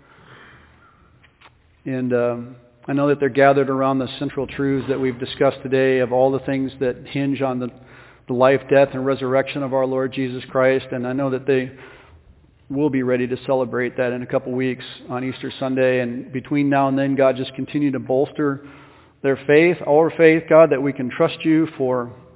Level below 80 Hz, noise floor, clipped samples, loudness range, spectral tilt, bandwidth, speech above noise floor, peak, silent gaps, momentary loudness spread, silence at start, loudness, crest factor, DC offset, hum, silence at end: -56 dBFS; -53 dBFS; under 0.1%; 6 LU; -10.5 dB/octave; 4 kHz; 34 dB; 0 dBFS; none; 11 LU; 1.85 s; -20 LUFS; 20 dB; under 0.1%; none; 0.2 s